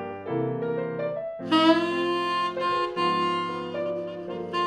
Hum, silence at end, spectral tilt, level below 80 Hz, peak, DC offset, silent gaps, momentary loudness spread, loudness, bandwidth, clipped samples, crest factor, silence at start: none; 0 s; -6 dB/octave; -68 dBFS; -6 dBFS; under 0.1%; none; 10 LU; -26 LUFS; 9.8 kHz; under 0.1%; 20 dB; 0 s